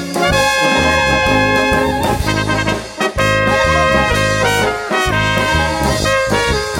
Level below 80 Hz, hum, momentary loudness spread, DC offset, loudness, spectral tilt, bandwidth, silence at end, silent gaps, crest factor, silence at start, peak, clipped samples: -28 dBFS; none; 4 LU; under 0.1%; -13 LUFS; -4 dB/octave; 16.5 kHz; 0 s; none; 14 dB; 0 s; 0 dBFS; under 0.1%